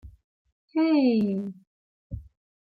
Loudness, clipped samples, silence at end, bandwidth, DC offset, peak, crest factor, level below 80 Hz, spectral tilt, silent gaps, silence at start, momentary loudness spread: -24 LUFS; under 0.1%; 0.55 s; 5 kHz; under 0.1%; -12 dBFS; 16 dB; -52 dBFS; -9.5 dB/octave; 0.24-0.45 s, 0.52-0.68 s, 1.67-2.10 s; 0.05 s; 21 LU